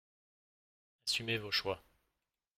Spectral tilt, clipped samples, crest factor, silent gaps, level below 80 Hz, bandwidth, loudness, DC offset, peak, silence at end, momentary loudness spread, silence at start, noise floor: -2.5 dB/octave; under 0.1%; 22 dB; none; -70 dBFS; 16 kHz; -36 LUFS; under 0.1%; -20 dBFS; 0.8 s; 8 LU; 1.05 s; -88 dBFS